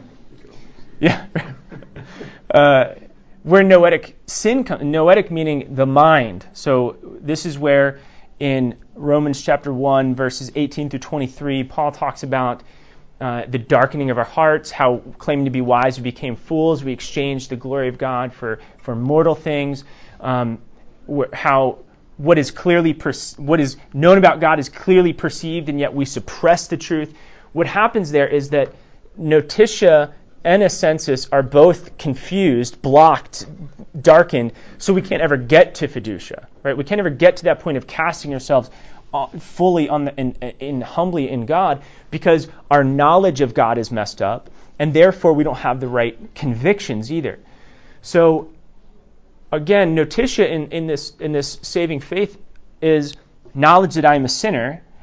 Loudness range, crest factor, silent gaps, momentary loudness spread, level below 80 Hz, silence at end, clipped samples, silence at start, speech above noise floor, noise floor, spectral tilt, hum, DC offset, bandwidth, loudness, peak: 6 LU; 18 dB; none; 14 LU; -48 dBFS; 0.05 s; under 0.1%; 0.25 s; 29 dB; -45 dBFS; -6 dB/octave; none; under 0.1%; 8 kHz; -17 LUFS; 0 dBFS